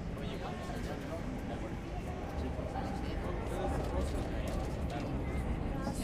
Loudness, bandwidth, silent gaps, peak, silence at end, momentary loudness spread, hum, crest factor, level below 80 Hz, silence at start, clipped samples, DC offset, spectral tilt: -39 LUFS; 15.5 kHz; none; -22 dBFS; 0 s; 4 LU; none; 14 dB; -42 dBFS; 0 s; under 0.1%; under 0.1%; -6.5 dB/octave